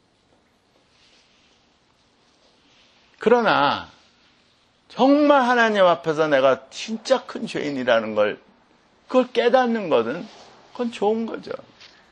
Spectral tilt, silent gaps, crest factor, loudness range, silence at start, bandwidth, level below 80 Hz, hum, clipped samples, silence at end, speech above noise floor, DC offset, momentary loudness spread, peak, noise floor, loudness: -5 dB/octave; none; 20 dB; 5 LU; 3.2 s; 9.4 kHz; -68 dBFS; none; under 0.1%; 0.55 s; 42 dB; under 0.1%; 16 LU; -2 dBFS; -61 dBFS; -20 LUFS